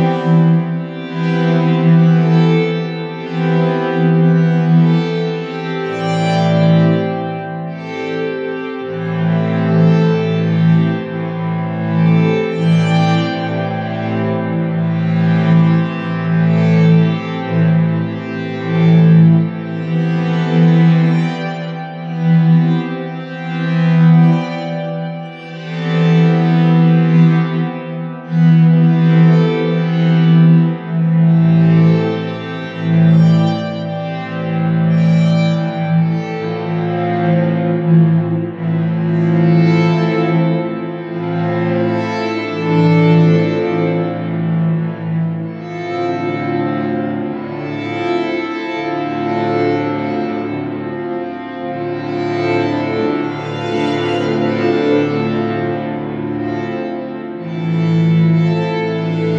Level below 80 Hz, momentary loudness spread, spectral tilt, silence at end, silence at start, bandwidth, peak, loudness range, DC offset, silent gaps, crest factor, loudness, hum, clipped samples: -58 dBFS; 12 LU; -9 dB/octave; 0 s; 0 s; 5.8 kHz; 0 dBFS; 7 LU; under 0.1%; none; 14 dB; -15 LUFS; none; under 0.1%